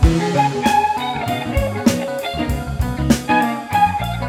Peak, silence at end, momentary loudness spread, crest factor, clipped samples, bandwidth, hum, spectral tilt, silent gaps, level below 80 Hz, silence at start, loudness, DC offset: -2 dBFS; 0 s; 7 LU; 16 dB; under 0.1%; 17 kHz; none; -5.5 dB/octave; none; -26 dBFS; 0 s; -18 LUFS; under 0.1%